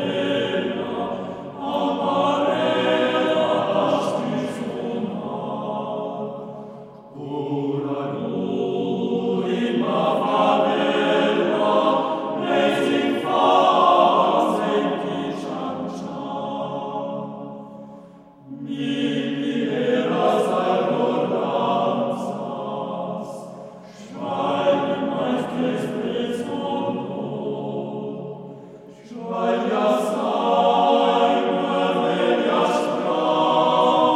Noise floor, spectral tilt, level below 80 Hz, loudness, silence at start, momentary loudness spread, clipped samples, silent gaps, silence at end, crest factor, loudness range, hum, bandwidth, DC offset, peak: -45 dBFS; -6 dB/octave; -68 dBFS; -22 LUFS; 0 s; 14 LU; under 0.1%; none; 0 s; 18 dB; 9 LU; none; 13.5 kHz; under 0.1%; -4 dBFS